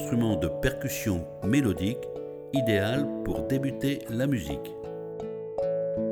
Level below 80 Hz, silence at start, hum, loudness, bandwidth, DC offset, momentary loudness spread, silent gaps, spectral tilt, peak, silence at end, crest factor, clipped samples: -46 dBFS; 0 s; none; -29 LUFS; over 20 kHz; under 0.1%; 11 LU; none; -6 dB/octave; -10 dBFS; 0 s; 18 dB; under 0.1%